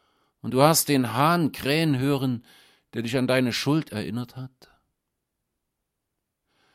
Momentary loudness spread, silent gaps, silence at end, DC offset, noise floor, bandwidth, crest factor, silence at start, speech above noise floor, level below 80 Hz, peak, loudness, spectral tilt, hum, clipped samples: 17 LU; none; 2.25 s; under 0.1%; -81 dBFS; 16.5 kHz; 24 dB; 0.45 s; 58 dB; -62 dBFS; -2 dBFS; -23 LUFS; -5 dB/octave; none; under 0.1%